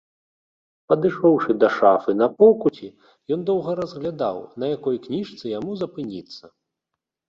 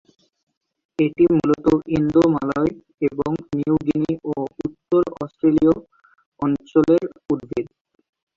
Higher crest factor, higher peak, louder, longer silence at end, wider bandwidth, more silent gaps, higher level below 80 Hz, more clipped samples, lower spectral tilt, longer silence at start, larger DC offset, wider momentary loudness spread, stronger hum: about the same, 20 dB vs 16 dB; about the same, -2 dBFS vs -4 dBFS; about the same, -21 LUFS vs -20 LUFS; first, 0.9 s vs 0.7 s; about the same, 7 kHz vs 7.2 kHz; second, none vs 2.94-2.98 s, 6.26-6.32 s; second, -64 dBFS vs -50 dBFS; neither; about the same, -8 dB/octave vs -9 dB/octave; about the same, 0.9 s vs 1 s; neither; first, 17 LU vs 10 LU; neither